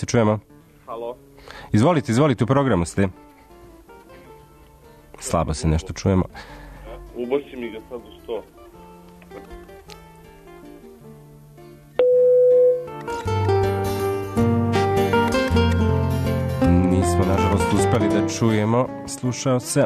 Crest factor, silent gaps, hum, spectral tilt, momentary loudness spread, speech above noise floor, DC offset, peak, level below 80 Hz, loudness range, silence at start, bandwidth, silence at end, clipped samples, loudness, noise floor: 14 dB; none; none; -6.5 dB/octave; 22 LU; 27 dB; under 0.1%; -6 dBFS; -38 dBFS; 13 LU; 0 s; 13.5 kHz; 0 s; under 0.1%; -20 LUFS; -48 dBFS